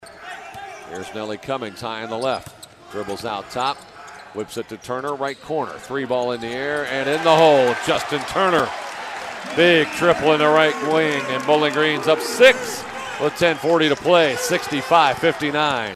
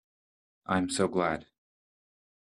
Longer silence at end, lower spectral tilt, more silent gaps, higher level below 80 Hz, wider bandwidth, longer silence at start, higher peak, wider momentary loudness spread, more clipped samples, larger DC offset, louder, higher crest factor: second, 0 s vs 1.05 s; about the same, -4 dB/octave vs -5 dB/octave; neither; first, -56 dBFS vs -66 dBFS; first, 14.5 kHz vs 12 kHz; second, 0.05 s vs 0.7 s; first, -2 dBFS vs -12 dBFS; first, 17 LU vs 11 LU; neither; neither; first, -19 LUFS vs -30 LUFS; about the same, 18 dB vs 20 dB